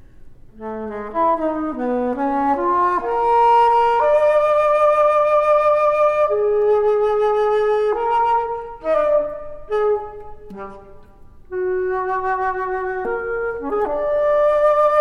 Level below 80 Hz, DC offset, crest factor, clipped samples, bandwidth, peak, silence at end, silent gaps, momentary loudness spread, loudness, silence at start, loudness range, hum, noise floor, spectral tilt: -44 dBFS; under 0.1%; 12 dB; under 0.1%; 9.4 kHz; -6 dBFS; 0 s; none; 13 LU; -18 LUFS; 0.2 s; 8 LU; none; -42 dBFS; -6 dB/octave